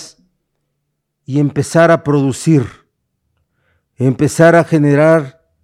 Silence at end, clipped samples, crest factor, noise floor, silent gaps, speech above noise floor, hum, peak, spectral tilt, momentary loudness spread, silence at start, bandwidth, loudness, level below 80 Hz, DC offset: 0.35 s; under 0.1%; 14 dB; -71 dBFS; none; 60 dB; none; 0 dBFS; -7 dB/octave; 9 LU; 0 s; 13.5 kHz; -12 LUFS; -52 dBFS; under 0.1%